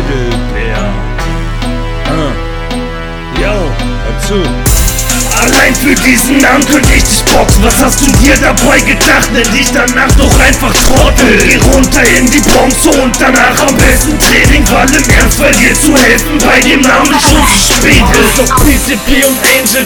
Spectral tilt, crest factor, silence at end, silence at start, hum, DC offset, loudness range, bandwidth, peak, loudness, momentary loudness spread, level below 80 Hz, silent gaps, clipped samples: -3.5 dB/octave; 6 dB; 0 s; 0 s; none; under 0.1%; 9 LU; over 20 kHz; 0 dBFS; -7 LUFS; 11 LU; -14 dBFS; none; 6%